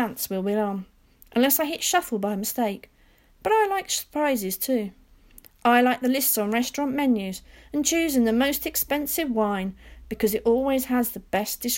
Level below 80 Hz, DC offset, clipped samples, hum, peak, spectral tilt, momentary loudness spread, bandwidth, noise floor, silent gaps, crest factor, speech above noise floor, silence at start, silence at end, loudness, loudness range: -52 dBFS; under 0.1%; under 0.1%; none; -6 dBFS; -3.5 dB/octave; 9 LU; 17 kHz; -57 dBFS; none; 18 dB; 33 dB; 0 s; 0 s; -24 LUFS; 3 LU